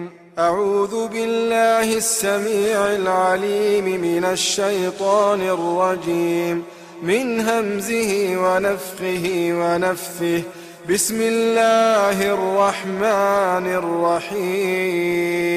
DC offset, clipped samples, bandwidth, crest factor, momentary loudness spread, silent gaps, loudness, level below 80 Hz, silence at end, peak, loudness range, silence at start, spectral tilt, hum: under 0.1%; under 0.1%; 15.5 kHz; 14 dB; 6 LU; none; -19 LUFS; -58 dBFS; 0 s; -6 dBFS; 3 LU; 0 s; -3.5 dB/octave; none